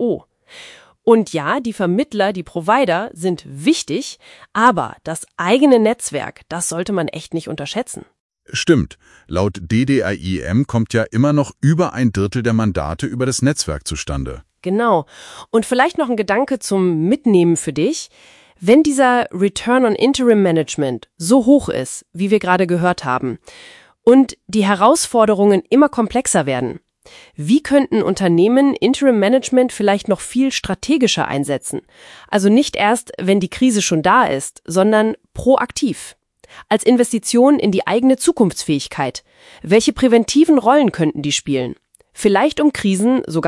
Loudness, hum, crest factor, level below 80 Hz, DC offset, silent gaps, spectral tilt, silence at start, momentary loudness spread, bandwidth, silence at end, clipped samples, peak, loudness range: -16 LUFS; none; 16 dB; -44 dBFS; under 0.1%; 8.20-8.29 s; -5 dB/octave; 0 s; 11 LU; 12 kHz; 0 s; under 0.1%; 0 dBFS; 4 LU